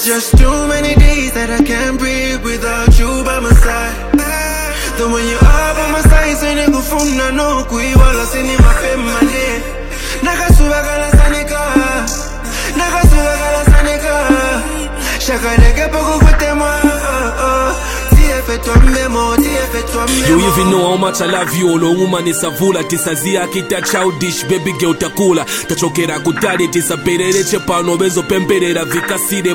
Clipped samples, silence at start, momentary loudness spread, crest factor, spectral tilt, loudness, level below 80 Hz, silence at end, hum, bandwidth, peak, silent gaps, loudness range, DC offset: 0.3%; 0 s; 6 LU; 12 dB; -4.5 dB/octave; -13 LUFS; -14 dBFS; 0 s; none; 17 kHz; 0 dBFS; none; 2 LU; under 0.1%